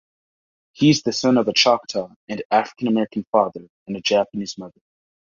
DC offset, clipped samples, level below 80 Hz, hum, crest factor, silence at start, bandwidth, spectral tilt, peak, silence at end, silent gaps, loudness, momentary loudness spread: under 0.1%; under 0.1%; -62 dBFS; none; 20 dB; 0.8 s; 7.4 kHz; -4.5 dB/octave; -2 dBFS; 0.55 s; 2.16-2.27 s, 2.45-2.50 s, 3.27-3.33 s, 3.69-3.86 s; -20 LUFS; 15 LU